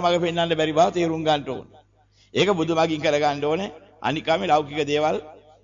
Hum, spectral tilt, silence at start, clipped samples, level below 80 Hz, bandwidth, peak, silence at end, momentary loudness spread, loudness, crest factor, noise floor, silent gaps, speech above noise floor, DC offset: none; -5 dB/octave; 0 s; under 0.1%; -56 dBFS; 7.6 kHz; -8 dBFS; 0.25 s; 9 LU; -22 LUFS; 16 dB; -59 dBFS; none; 37 dB; under 0.1%